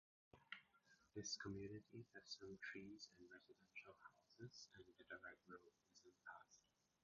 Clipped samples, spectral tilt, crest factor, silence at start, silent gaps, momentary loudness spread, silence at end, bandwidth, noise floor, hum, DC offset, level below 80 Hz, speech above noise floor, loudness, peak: under 0.1%; -3 dB/octave; 22 dB; 0.35 s; none; 15 LU; 0.45 s; 7.2 kHz; -78 dBFS; none; under 0.1%; -82 dBFS; 19 dB; -58 LUFS; -38 dBFS